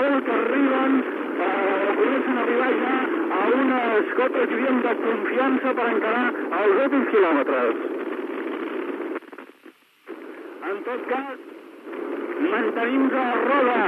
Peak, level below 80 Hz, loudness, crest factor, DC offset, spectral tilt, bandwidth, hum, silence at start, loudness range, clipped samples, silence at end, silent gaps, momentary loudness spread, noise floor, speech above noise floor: -8 dBFS; under -90 dBFS; -22 LUFS; 16 dB; under 0.1%; -6 dB/octave; 4.6 kHz; none; 0 s; 10 LU; under 0.1%; 0 s; none; 14 LU; -51 dBFS; 29 dB